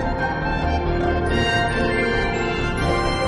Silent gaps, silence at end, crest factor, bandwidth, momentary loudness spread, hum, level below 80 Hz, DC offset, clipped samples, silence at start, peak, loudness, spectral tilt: none; 0 s; 12 dB; 11 kHz; 3 LU; none; -28 dBFS; under 0.1%; under 0.1%; 0 s; -8 dBFS; -21 LUFS; -6 dB/octave